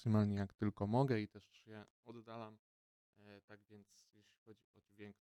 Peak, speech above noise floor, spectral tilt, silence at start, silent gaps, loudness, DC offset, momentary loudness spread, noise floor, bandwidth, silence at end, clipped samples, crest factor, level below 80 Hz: -22 dBFS; over 48 dB; -8.5 dB/octave; 0 s; 1.90-2.03 s, 2.59-3.13 s, 3.43-3.48 s, 4.38-4.46 s, 4.64-4.74 s; -40 LUFS; under 0.1%; 26 LU; under -90 dBFS; 9 kHz; 0.1 s; under 0.1%; 20 dB; -76 dBFS